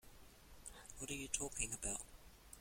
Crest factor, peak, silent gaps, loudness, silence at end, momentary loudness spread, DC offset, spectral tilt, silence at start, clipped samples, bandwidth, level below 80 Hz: 26 dB; -24 dBFS; none; -44 LUFS; 0 s; 22 LU; under 0.1%; -2 dB/octave; 0.05 s; under 0.1%; 16.5 kHz; -60 dBFS